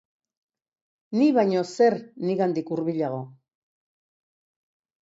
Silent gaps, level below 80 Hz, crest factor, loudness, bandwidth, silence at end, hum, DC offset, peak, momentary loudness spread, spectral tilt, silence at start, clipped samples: none; -76 dBFS; 18 dB; -24 LUFS; 8 kHz; 1.7 s; none; under 0.1%; -10 dBFS; 10 LU; -7 dB/octave; 1.1 s; under 0.1%